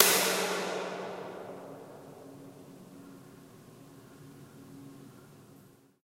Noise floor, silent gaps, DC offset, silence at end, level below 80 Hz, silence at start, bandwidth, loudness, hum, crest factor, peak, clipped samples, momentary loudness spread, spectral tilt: -59 dBFS; none; under 0.1%; 0.5 s; -78 dBFS; 0 s; 16 kHz; -31 LUFS; none; 34 dB; 0 dBFS; under 0.1%; 24 LU; -1.5 dB/octave